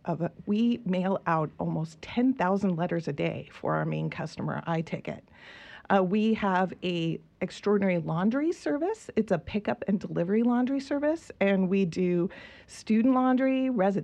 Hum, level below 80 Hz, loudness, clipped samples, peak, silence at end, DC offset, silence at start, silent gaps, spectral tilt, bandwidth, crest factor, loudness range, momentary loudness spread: none; -62 dBFS; -28 LUFS; under 0.1%; -10 dBFS; 0 s; under 0.1%; 0.05 s; none; -7.5 dB/octave; 9.4 kHz; 18 dB; 3 LU; 10 LU